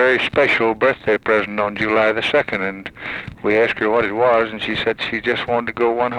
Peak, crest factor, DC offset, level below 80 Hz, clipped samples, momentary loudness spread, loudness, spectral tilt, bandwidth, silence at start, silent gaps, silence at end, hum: -4 dBFS; 14 dB; under 0.1%; -50 dBFS; under 0.1%; 8 LU; -18 LUFS; -5.5 dB/octave; 10.5 kHz; 0 s; none; 0 s; none